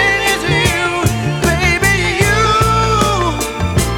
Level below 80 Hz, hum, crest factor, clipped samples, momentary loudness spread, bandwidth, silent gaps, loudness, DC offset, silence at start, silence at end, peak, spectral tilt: -26 dBFS; none; 14 dB; under 0.1%; 5 LU; 18.5 kHz; none; -13 LUFS; under 0.1%; 0 s; 0 s; 0 dBFS; -4 dB/octave